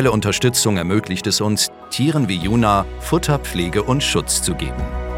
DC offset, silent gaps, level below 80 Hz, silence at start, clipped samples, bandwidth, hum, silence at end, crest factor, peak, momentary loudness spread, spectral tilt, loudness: under 0.1%; none; -32 dBFS; 0 s; under 0.1%; 17 kHz; none; 0 s; 18 dB; 0 dBFS; 5 LU; -4 dB/octave; -18 LUFS